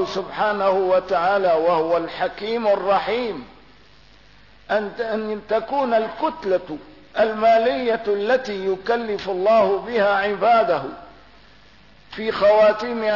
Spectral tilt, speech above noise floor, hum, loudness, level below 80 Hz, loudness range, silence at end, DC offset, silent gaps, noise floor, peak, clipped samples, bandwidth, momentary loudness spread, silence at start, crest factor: -5.5 dB/octave; 31 dB; none; -20 LUFS; -56 dBFS; 5 LU; 0 s; 0.2%; none; -51 dBFS; -8 dBFS; under 0.1%; 6 kHz; 9 LU; 0 s; 14 dB